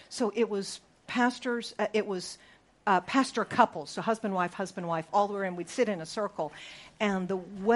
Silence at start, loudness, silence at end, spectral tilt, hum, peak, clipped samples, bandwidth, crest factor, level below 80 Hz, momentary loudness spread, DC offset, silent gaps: 0.1 s; -30 LUFS; 0 s; -4.5 dB/octave; none; -8 dBFS; under 0.1%; 11.5 kHz; 24 dB; -70 dBFS; 11 LU; under 0.1%; none